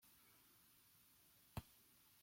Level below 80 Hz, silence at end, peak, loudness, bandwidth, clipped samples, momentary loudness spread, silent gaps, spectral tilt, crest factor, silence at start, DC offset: -72 dBFS; 0 s; -36 dBFS; -63 LUFS; 16.5 kHz; under 0.1%; 12 LU; none; -4.5 dB/octave; 28 dB; 0 s; under 0.1%